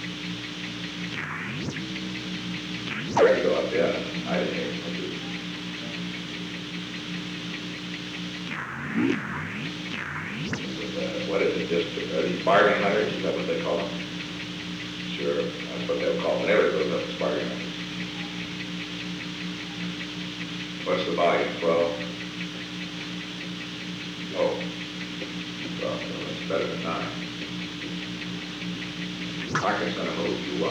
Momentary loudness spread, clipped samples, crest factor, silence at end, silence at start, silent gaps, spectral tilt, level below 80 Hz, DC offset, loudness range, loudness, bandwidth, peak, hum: 10 LU; under 0.1%; 22 dB; 0 s; 0 s; none; -5 dB/octave; -58 dBFS; under 0.1%; 7 LU; -28 LUFS; 12.5 kHz; -8 dBFS; 60 Hz at -45 dBFS